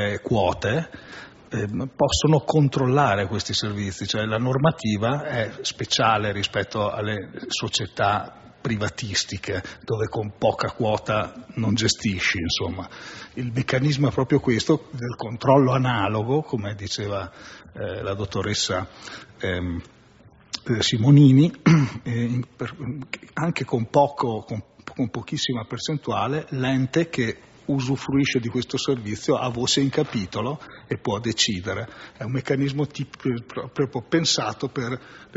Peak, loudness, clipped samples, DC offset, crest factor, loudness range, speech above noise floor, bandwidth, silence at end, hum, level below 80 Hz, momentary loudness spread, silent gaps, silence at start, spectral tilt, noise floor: -4 dBFS; -23 LUFS; under 0.1%; under 0.1%; 20 dB; 6 LU; 29 dB; 8 kHz; 0 s; none; -50 dBFS; 13 LU; none; 0 s; -5 dB/octave; -52 dBFS